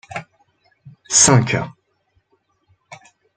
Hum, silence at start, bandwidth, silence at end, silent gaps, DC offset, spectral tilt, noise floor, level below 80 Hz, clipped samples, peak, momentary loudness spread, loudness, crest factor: none; 0.1 s; 9.6 kHz; 0.4 s; none; under 0.1%; -3 dB/octave; -65 dBFS; -52 dBFS; under 0.1%; 0 dBFS; 22 LU; -14 LUFS; 22 dB